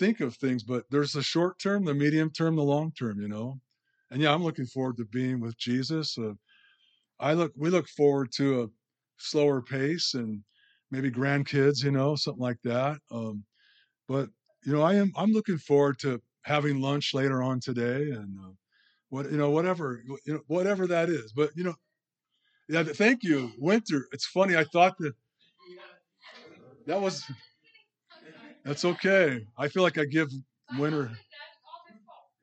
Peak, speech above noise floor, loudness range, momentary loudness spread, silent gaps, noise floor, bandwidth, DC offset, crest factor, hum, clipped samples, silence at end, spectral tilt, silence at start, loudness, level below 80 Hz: -8 dBFS; 55 dB; 4 LU; 14 LU; none; -83 dBFS; 8.8 kHz; under 0.1%; 20 dB; none; under 0.1%; 0.65 s; -6 dB/octave; 0 s; -28 LUFS; -80 dBFS